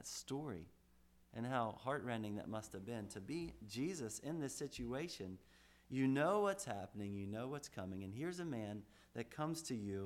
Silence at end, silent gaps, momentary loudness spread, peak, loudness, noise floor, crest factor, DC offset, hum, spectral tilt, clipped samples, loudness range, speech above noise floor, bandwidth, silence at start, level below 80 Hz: 0 s; none; 12 LU; -26 dBFS; -44 LUFS; -70 dBFS; 18 dB; under 0.1%; none; -5 dB/octave; under 0.1%; 5 LU; 26 dB; 16.5 kHz; 0 s; -70 dBFS